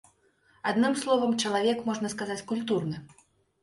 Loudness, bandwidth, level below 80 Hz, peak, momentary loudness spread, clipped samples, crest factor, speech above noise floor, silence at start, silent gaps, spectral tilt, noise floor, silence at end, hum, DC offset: -28 LUFS; 11.5 kHz; -68 dBFS; -12 dBFS; 9 LU; under 0.1%; 18 dB; 37 dB; 0.65 s; none; -4.5 dB/octave; -65 dBFS; 0.55 s; none; under 0.1%